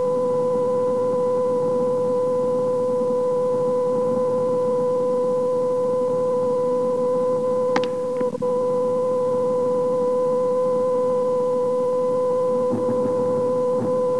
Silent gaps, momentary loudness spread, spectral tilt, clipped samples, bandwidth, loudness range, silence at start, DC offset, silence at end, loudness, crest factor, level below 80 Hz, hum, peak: none; 1 LU; -7 dB/octave; under 0.1%; 11 kHz; 1 LU; 0 s; 0.6%; 0 s; -21 LUFS; 16 dB; -72 dBFS; none; -6 dBFS